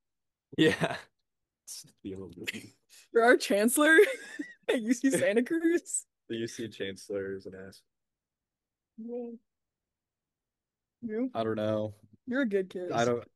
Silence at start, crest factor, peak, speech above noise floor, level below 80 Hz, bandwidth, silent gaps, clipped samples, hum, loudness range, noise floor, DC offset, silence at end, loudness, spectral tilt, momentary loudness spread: 0.6 s; 22 dB; -10 dBFS; over 61 dB; -74 dBFS; 12.5 kHz; none; under 0.1%; none; 18 LU; under -90 dBFS; under 0.1%; 0.1 s; -29 LUFS; -4 dB/octave; 20 LU